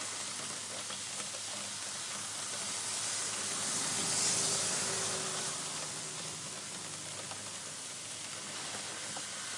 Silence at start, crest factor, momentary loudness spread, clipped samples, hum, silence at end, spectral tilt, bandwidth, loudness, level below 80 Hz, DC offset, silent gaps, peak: 0 s; 18 dB; 10 LU; under 0.1%; none; 0 s; -0.5 dB/octave; 11.5 kHz; -35 LUFS; -80 dBFS; under 0.1%; none; -20 dBFS